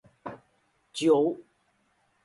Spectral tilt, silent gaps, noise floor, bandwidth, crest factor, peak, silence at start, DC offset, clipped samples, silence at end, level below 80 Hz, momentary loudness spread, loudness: -5.5 dB/octave; none; -70 dBFS; 11.5 kHz; 20 dB; -10 dBFS; 0.25 s; under 0.1%; under 0.1%; 0.85 s; -74 dBFS; 20 LU; -25 LUFS